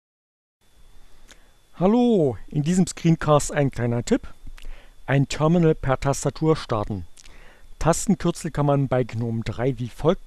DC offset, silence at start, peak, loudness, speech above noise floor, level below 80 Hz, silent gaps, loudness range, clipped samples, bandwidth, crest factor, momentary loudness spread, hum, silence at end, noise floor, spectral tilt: under 0.1%; 0.95 s; -6 dBFS; -22 LUFS; 29 dB; -40 dBFS; none; 3 LU; under 0.1%; 13 kHz; 18 dB; 8 LU; none; 0 s; -50 dBFS; -6.5 dB/octave